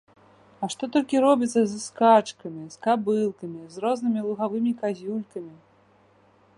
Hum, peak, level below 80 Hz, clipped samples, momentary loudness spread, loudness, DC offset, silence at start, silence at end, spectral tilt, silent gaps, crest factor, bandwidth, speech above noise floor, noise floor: 50 Hz at -55 dBFS; -4 dBFS; -72 dBFS; under 0.1%; 18 LU; -24 LUFS; under 0.1%; 0.6 s; 1.05 s; -5.5 dB/octave; none; 20 dB; 11.5 kHz; 35 dB; -59 dBFS